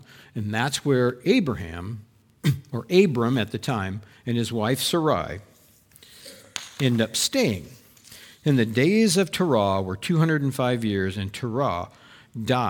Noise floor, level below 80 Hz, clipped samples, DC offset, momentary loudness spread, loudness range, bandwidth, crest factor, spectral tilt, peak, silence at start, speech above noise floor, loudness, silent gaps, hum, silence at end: -55 dBFS; -56 dBFS; under 0.1%; under 0.1%; 15 LU; 5 LU; 19 kHz; 20 dB; -5 dB/octave; -6 dBFS; 0.35 s; 32 dB; -24 LUFS; none; none; 0 s